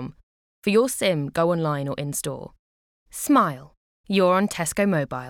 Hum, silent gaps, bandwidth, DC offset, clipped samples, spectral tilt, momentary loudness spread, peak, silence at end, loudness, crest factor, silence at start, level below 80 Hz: none; 0.23-0.62 s, 2.59-3.06 s, 3.77-4.04 s; 19 kHz; under 0.1%; under 0.1%; -5 dB/octave; 13 LU; -8 dBFS; 0 s; -23 LUFS; 16 dB; 0 s; -56 dBFS